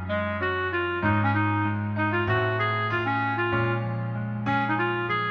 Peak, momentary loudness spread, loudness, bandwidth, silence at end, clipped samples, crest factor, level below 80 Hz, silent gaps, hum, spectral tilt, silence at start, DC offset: -12 dBFS; 4 LU; -25 LUFS; 5.6 kHz; 0 s; under 0.1%; 14 dB; -56 dBFS; none; none; -8.5 dB/octave; 0 s; under 0.1%